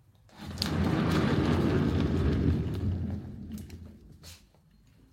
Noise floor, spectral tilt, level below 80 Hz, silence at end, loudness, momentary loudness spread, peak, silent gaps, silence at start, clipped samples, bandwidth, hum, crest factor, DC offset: -61 dBFS; -7 dB/octave; -40 dBFS; 0.75 s; -29 LUFS; 23 LU; -8 dBFS; none; 0.35 s; under 0.1%; 16 kHz; none; 22 dB; under 0.1%